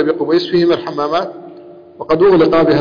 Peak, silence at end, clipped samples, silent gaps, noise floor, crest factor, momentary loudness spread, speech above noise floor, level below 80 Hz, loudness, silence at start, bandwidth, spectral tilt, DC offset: -4 dBFS; 0 s; under 0.1%; none; -36 dBFS; 10 dB; 16 LU; 24 dB; -46 dBFS; -13 LUFS; 0 s; 5.2 kHz; -7.5 dB/octave; under 0.1%